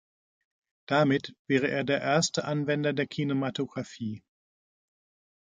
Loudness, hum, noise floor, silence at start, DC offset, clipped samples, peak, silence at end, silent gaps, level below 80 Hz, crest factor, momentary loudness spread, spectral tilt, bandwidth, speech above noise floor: -28 LUFS; none; under -90 dBFS; 0.9 s; under 0.1%; under 0.1%; -10 dBFS; 1.3 s; 1.39-1.45 s; -70 dBFS; 20 dB; 11 LU; -5 dB/octave; 9.6 kHz; over 62 dB